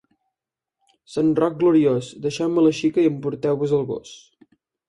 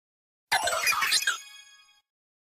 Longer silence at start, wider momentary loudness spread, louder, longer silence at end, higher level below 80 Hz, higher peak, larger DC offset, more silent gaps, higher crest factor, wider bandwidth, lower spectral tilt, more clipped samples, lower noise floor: first, 1.1 s vs 0.5 s; about the same, 10 LU vs 12 LU; first, -21 LUFS vs -25 LUFS; second, 0.7 s vs 0.85 s; first, -62 dBFS vs -68 dBFS; first, -6 dBFS vs -12 dBFS; neither; neither; about the same, 16 dB vs 20 dB; second, 11 kHz vs 15.5 kHz; first, -7 dB/octave vs 2 dB/octave; neither; first, -86 dBFS vs -56 dBFS